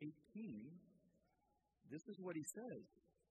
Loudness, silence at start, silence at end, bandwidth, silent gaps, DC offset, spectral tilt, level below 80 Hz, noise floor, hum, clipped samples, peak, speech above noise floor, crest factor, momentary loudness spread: -53 LUFS; 0 s; 0.3 s; 8.8 kHz; none; under 0.1%; -5.5 dB/octave; under -90 dBFS; -84 dBFS; none; under 0.1%; -38 dBFS; 32 dB; 18 dB; 9 LU